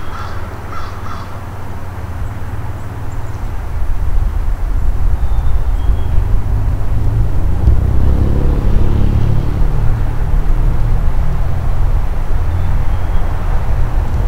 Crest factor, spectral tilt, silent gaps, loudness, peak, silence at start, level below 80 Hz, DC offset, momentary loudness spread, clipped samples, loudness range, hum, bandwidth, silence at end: 12 dB; -8 dB/octave; none; -19 LUFS; 0 dBFS; 0 s; -14 dBFS; under 0.1%; 11 LU; under 0.1%; 9 LU; none; 6.2 kHz; 0 s